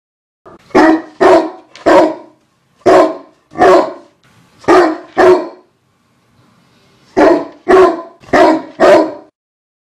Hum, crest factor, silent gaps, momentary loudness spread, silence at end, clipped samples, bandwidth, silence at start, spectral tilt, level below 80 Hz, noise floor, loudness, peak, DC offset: none; 12 dB; none; 13 LU; 0.65 s; 0.7%; 11.5 kHz; 0.75 s; -5 dB/octave; -46 dBFS; -56 dBFS; -10 LUFS; 0 dBFS; under 0.1%